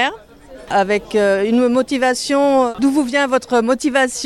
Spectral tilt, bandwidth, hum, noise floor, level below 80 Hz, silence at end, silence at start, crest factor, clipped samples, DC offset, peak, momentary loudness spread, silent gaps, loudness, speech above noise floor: -3.5 dB/octave; 14 kHz; none; -39 dBFS; -50 dBFS; 0 s; 0 s; 14 dB; under 0.1%; under 0.1%; -2 dBFS; 2 LU; none; -16 LUFS; 24 dB